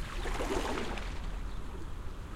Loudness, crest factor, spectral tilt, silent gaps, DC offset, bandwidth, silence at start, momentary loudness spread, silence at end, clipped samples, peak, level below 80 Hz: -39 LUFS; 18 dB; -5 dB/octave; none; under 0.1%; 15.5 kHz; 0 s; 10 LU; 0 s; under 0.1%; -18 dBFS; -40 dBFS